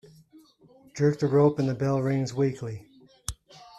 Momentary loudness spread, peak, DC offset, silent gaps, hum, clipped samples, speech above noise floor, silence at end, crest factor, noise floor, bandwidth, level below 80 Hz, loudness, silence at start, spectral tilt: 19 LU; -10 dBFS; under 0.1%; none; none; under 0.1%; 32 dB; 0.15 s; 18 dB; -57 dBFS; 13 kHz; -54 dBFS; -25 LUFS; 0.95 s; -7 dB/octave